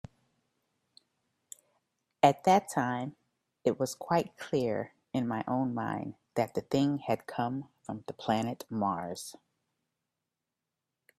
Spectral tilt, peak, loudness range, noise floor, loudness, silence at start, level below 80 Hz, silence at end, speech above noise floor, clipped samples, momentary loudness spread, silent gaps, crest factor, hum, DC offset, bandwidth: -6 dB/octave; -10 dBFS; 6 LU; -88 dBFS; -32 LUFS; 2.25 s; -70 dBFS; 1.85 s; 57 dB; under 0.1%; 16 LU; none; 24 dB; none; under 0.1%; 14.5 kHz